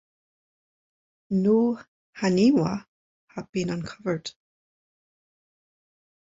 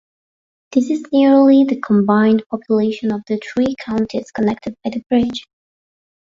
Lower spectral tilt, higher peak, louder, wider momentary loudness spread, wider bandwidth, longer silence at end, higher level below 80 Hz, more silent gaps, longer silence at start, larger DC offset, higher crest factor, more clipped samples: about the same, -6.5 dB/octave vs -7 dB/octave; second, -10 dBFS vs -2 dBFS; second, -25 LUFS vs -16 LUFS; first, 16 LU vs 11 LU; about the same, 7.8 kHz vs 7.6 kHz; first, 2.1 s vs 0.8 s; second, -62 dBFS vs -54 dBFS; first, 1.88-2.13 s, 2.88-3.28 s, 3.49-3.53 s vs 5.06-5.10 s; first, 1.3 s vs 0.7 s; neither; about the same, 18 dB vs 14 dB; neither